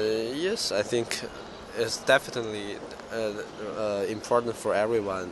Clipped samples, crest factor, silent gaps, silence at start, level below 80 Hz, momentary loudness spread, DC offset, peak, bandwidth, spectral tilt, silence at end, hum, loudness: under 0.1%; 22 dB; none; 0 s; -58 dBFS; 12 LU; under 0.1%; -6 dBFS; 12 kHz; -3.5 dB/octave; 0 s; none; -28 LUFS